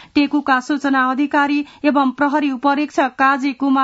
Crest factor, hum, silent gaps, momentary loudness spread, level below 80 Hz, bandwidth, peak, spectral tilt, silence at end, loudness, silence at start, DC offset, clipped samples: 14 dB; none; none; 3 LU; -60 dBFS; 8 kHz; -2 dBFS; -4 dB/octave; 0 s; -17 LUFS; 0.15 s; under 0.1%; under 0.1%